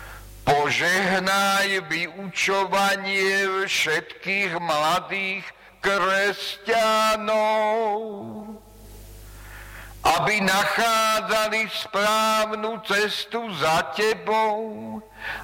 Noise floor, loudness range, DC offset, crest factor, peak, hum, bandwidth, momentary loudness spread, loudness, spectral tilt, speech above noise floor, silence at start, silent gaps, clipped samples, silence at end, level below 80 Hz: -43 dBFS; 3 LU; under 0.1%; 12 dB; -10 dBFS; none; 16.5 kHz; 14 LU; -22 LUFS; -2.5 dB/octave; 20 dB; 0 s; none; under 0.1%; 0 s; -52 dBFS